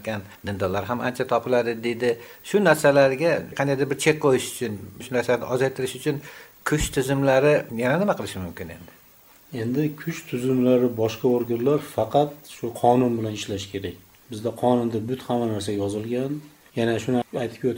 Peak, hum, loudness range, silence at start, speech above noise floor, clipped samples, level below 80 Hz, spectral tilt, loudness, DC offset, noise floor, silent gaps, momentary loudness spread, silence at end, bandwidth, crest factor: -2 dBFS; none; 4 LU; 0 s; 29 dB; under 0.1%; -50 dBFS; -5.5 dB/octave; -24 LUFS; under 0.1%; -53 dBFS; none; 13 LU; 0 s; 17 kHz; 20 dB